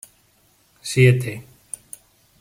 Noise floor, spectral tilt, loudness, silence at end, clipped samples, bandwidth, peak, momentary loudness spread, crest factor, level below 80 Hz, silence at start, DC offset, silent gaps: -59 dBFS; -6 dB/octave; -18 LUFS; 1 s; under 0.1%; 16 kHz; -2 dBFS; 24 LU; 20 dB; -58 dBFS; 0.85 s; under 0.1%; none